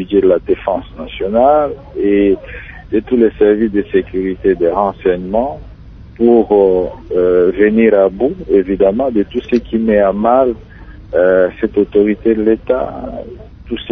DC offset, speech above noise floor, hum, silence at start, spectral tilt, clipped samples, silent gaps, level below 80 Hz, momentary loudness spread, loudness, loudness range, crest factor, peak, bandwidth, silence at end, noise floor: under 0.1%; 22 dB; none; 0 s; -9.5 dB/octave; under 0.1%; none; -36 dBFS; 11 LU; -13 LUFS; 2 LU; 14 dB; 0 dBFS; 5 kHz; 0 s; -34 dBFS